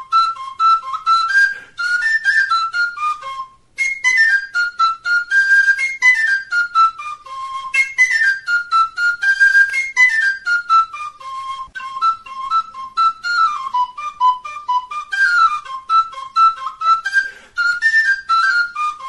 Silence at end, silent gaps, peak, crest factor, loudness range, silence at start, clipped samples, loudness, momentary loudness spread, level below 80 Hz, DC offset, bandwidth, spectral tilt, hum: 0 s; none; -2 dBFS; 14 dB; 5 LU; 0 s; under 0.1%; -15 LUFS; 13 LU; -60 dBFS; 0.1%; 11.5 kHz; 2.5 dB/octave; none